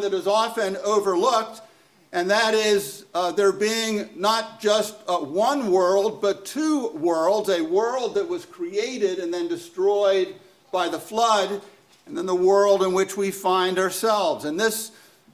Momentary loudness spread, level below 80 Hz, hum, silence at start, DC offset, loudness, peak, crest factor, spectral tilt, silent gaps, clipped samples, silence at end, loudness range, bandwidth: 9 LU; -70 dBFS; none; 0 s; under 0.1%; -22 LUFS; -6 dBFS; 16 dB; -3.5 dB/octave; none; under 0.1%; 0.45 s; 2 LU; 16 kHz